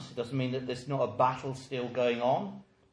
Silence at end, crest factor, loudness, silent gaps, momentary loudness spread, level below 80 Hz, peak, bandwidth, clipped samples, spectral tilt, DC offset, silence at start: 0.3 s; 20 dB; -32 LUFS; none; 10 LU; -68 dBFS; -12 dBFS; 10.5 kHz; under 0.1%; -6.5 dB/octave; under 0.1%; 0 s